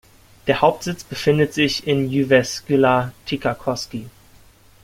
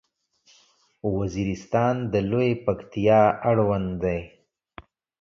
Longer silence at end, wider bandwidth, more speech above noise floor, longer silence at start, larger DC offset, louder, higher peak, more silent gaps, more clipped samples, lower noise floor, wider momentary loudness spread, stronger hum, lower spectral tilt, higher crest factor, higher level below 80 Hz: second, 0.75 s vs 0.95 s; first, 16.5 kHz vs 7.4 kHz; second, 30 dB vs 40 dB; second, 0.45 s vs 1.05 s; neither; first, -19 LUFS vs -24 LUFS; first, -2 dBFS vs -6 dBFS; neither; neither; second, -49 dBFS vs -62 dBFS; about the same, 11 LU vs 10 LU; neither; second, -5 dB/octave vs -8 dB/octave; about the same, 18 dB vs 18 dB; about the same, -50 dBFS vs -48 dBFS